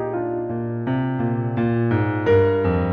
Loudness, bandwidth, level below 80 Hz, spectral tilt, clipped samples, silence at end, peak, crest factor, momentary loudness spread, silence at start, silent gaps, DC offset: -21 LUFS; 5.2 kHz; -48 dBFS; -10.5 dB/octave; under 0.1%; 0 s; -6 dBFS; 14 dB; 8 LU; 0 s; none; under 0.1%